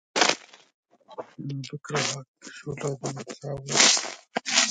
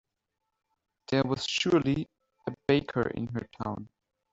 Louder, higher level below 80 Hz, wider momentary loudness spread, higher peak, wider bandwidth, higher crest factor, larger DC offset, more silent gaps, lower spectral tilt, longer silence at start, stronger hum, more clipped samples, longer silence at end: first, -24 LUFS vs -29 LUFS; second, -66 dBFS vs -58 dBFS; first, 22 LU vs 15 LU; first, 0 dBFS vs -10 dBFS; first, 11 kHz vs 8 kHz; first, 28 dB vs 20 dB; neither; first, 0.74-0.83 s, 2.28-2.34 s vs none; second, -1.5 dB/octave vs -5.5 dB/octave; second, 0.15 s vs 1.1 s; neither; neither; second, 0 s vs 0.45 s